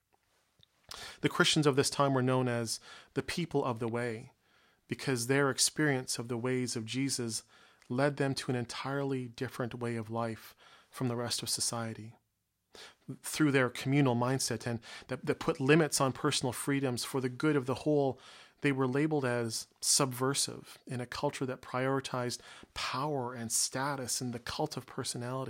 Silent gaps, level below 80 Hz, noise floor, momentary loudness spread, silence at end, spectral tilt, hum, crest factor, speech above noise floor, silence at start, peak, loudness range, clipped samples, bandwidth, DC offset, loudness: none; -68 dBFS; -81 dBFS; 12 LU; 0 s; -4 dB/octave; none; 22 dB; 48 dB; 0.95 s; -12 dBFS; 5 LU; under 0.1%; 16 kHz; under 0.1%; -32 LUFS